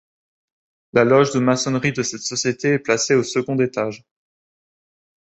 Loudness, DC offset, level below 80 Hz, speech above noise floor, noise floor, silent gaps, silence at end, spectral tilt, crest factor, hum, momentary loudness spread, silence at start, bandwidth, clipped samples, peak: -19 LUFS; under 0.1%; -60 dBFS; over 71 dB; under -90 dBFS; none; 1.25 s; -4.5 dB/octave; 20 dB; none; 8 LU; 0.95 s; 8.4 kHz; under 0.1%; -2 dBFS